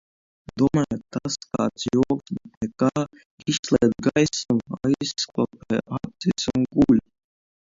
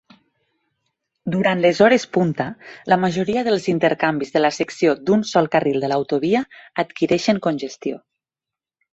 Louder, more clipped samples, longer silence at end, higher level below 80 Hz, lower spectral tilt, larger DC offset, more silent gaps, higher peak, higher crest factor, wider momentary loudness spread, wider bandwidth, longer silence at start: second, -24 LUFS vs -19 LUFS; neither; second, 0.75 s vs 0.95 s; first, -52 dBFS vs -60 dBFS; about the same, -5.5 dB/octave vs -6 dB/octave; neither; first, 2.57-2.61 s, 3.26-3.38 s, 3.59-3.63 s vs none; second, -6 dBFS vs -2 dBFS; about the same, 18 dB vs 18 dB; about the same, 10 LU vs 12 LU; about the same, 7.8 kHz vs 8.2 kHz; second, 0.55 s vs 1.25 s